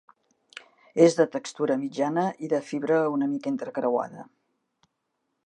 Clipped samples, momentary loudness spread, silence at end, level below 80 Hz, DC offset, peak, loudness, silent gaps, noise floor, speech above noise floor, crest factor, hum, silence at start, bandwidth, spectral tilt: under 0.1%; 25 LU; 1.25 s; -82 dBFS; under 0.1%; -6 dBFS; -26 LUFS; none; -78 dBFS; 54 dB; 22 dB; none; 0.95 s; 9.4 kHz; -6 dB/octave